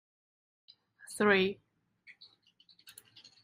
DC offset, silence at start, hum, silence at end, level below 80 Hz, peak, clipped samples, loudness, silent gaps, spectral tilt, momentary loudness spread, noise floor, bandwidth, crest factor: under 0.1%; 1.1 s; none; 1.9 s; -76 dBFS; -12 dBFS; under 0.1%; -29 LUFS; none; -4.5 dB/octave; 27 LU; -67 dBFS; 15.5 kHz; 24 dB